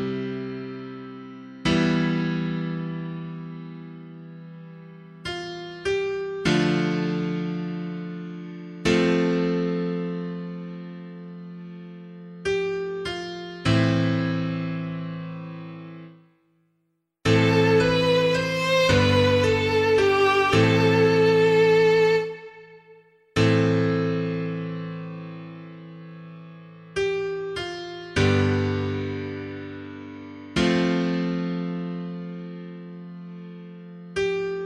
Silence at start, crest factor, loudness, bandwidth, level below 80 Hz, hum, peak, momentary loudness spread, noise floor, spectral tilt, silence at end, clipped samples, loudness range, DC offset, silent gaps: 0 s; 20 dB; -23 LUFS; 12 kHz; -50 dBFS; none; -6 dBFS; 22 LU; -73 dBFS; -6.5 dB/octave; 0 s; under 0.1%; 12 LU; under 0.1%; none